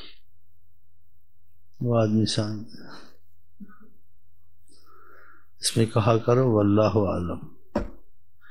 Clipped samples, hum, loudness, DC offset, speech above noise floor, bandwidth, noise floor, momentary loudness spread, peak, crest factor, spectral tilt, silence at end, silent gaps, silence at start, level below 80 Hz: under 0.1%; none; -24 LUFS; 1%; 41 dB; 13.5 kHz; -63 dBFS; 18 LU; -6 dBFS; 20 dB; -6 dB/octave; 0.6 s; none; 0 s; -50 dBFS